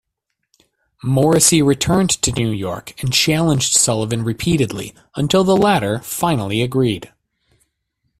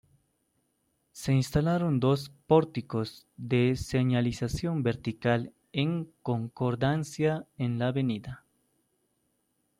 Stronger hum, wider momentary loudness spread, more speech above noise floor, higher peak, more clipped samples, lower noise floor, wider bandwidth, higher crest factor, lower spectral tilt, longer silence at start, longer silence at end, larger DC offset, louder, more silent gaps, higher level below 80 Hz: neither; first, 12 LU vs 9 LU; first, 59 dB vs 47 dB; first, 0 dBFS vs -10 dBFS; neither; about the same, -76 dBFS vs -75 dBFS; first, 16 kHz vs 14.5 kHz; about the same, 18 dB vs 20 dB; second, -4 dB/octave vs -7 dB/octave; about the same, 1.05 s vs 1.15 s; second, 1.15 s vs 1.45 s; neither; first, -16 LUFS vs -29 LUFS; neither; first, -44 dBFS vs -54 dBFS